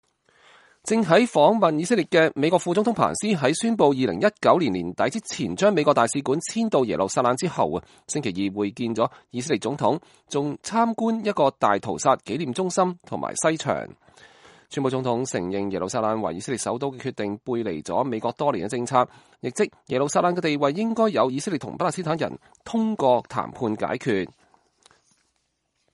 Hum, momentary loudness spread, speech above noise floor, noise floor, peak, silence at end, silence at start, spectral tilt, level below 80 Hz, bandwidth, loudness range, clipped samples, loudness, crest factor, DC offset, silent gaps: none; 9 LU; 50 dB; -73 dBFS; -2 dBFS; 1.65 s; 0.85 s; -5 dB/octave; -62 dBFS; 11.5 kHz; 6 LU; under 0.1%; -23 LUFS; 20 dB; under 0.1%; none